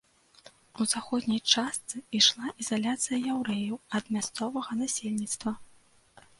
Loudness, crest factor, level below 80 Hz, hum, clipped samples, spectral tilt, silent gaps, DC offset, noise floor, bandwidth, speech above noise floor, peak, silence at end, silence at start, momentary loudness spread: -29 LUFS; 24 dB; -70 dBFS; none; under 0.1%; -2.5 dB/octave; none; under 0.1%; -60 dBFS; 11.5 kHz; 30 dB; -6 dBFS; 0.75 s; 0.75 s; 11 LU